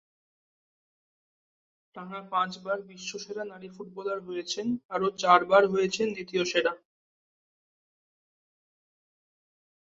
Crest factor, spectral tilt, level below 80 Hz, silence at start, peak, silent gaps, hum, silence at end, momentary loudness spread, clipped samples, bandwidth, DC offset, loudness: 26 dB; -4 dB/octave; -74 dBFS; 1.95 s; -6 dBFS; 4.85-4.89 s; none; 3.15 s; 19 LU; under 0.1%; 7.8 kHz; under 0.1%; -28 LUFS